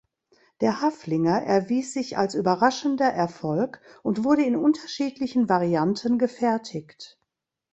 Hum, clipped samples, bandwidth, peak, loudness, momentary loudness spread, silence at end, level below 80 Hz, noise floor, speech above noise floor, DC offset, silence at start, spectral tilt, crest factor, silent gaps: none; under 0.1%; 8.2 kHz; -4 dBFS; -24 LUFS; 9 LU; 0.65 s; -64 dBFS; -80 dBFS; 57 dB; under 0.1%; 0.6 s; -6 dB/octave; 20 dB; none